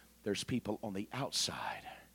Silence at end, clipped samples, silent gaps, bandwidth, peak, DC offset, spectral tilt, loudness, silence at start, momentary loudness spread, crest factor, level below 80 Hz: 0.05 s; under 0.1%; none; 17.5 kHz; -22 dBFS; under 0.1%; -3.5 dB/octave; -38 LUFS; 0 s; 8 LU; 18 dB; -66 dBFS